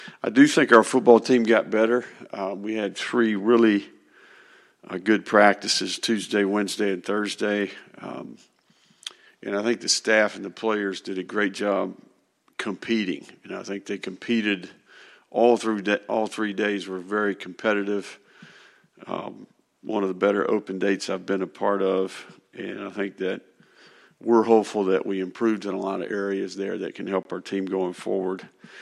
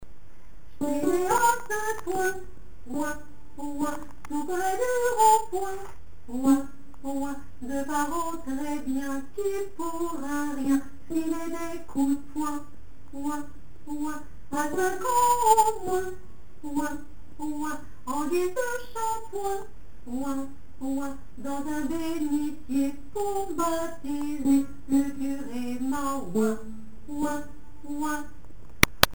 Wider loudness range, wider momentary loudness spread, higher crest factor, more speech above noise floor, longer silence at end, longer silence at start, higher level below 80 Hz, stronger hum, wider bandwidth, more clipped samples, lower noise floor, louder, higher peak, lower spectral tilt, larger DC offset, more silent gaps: about the same, 7 LU vs 6 LU; about the same, 17 LU vs 15 LU; about the same, 24 dB vs 28 dB; first, 41 dB vs 23 dB; about the same, 0 s vs 0.05 s; about the same, 0 s vs 0 s; second, -76 dBFS vs -48 dBFS; neither; second, 12.5 kHz vs over 20 kHz; neither; first, -64 dBFS vs -51 dBFS; first, -24 LUFS vs -28 LUFS; about the same, 0 dBFS vs 0 dBFS; about the same, -4 dB/octave vs -4 dB/octave; second, under 0.1% vs 2%; neither